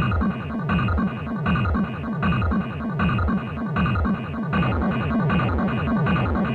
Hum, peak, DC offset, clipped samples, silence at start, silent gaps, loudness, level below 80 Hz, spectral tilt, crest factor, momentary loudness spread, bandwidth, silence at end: none; -10 dBFS; under 0.1%; under 0.1%; 0 s; none; -23 LUFS; -32 dBFS; -9.5 dB/octave; 12 dB; 5 LU; 4.7 kHz; 0 s